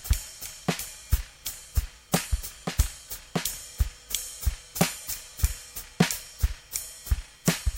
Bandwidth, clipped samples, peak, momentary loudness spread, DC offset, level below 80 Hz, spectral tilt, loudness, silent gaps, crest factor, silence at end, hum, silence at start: 17 kHz; under 0.1%; -4 dBFS; 7 LU; under 0.1%; -34 dBFS; -4 dB/octave; -31 LUFS; none; 26 dB; 0 s; none; 0 s